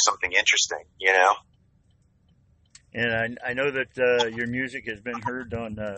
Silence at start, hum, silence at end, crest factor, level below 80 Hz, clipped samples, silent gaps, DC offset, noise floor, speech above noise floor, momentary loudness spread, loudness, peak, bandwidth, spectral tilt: 0 s; none; 0 s; 22 dB; -58 dBFS; under 0.1%; none; under 0.1%; -63 dBFS; 38 dB; 13 LU; -24 LUFS; -4 dBFS; 8.4 kHz; -2 dB/octave